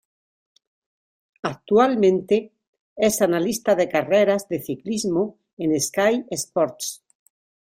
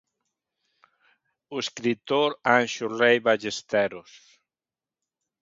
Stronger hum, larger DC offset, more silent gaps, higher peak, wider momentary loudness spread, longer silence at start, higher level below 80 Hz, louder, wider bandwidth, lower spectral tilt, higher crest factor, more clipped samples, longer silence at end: neither; neither; first, 2.67-2.73 s, 2.80-2.96 s, 5.53-5.57 s vs none; about the same, -4 dBFS vs -4 dBFS; about the same, 12 LU vs 11 LU; about the same, 1.45 s vs 1.5 s; first, -62 dBFS vs -72 dBFS; about the same, -22 LUFS vs -24 LUFS; first, 16 kHz vs 7.8 kHz; about the same, -4.5 dB/octave vs -3.5 dB/octave; about the same, 18 dB vs 22 dB; neither; second, 0.8 s vs 1.4 s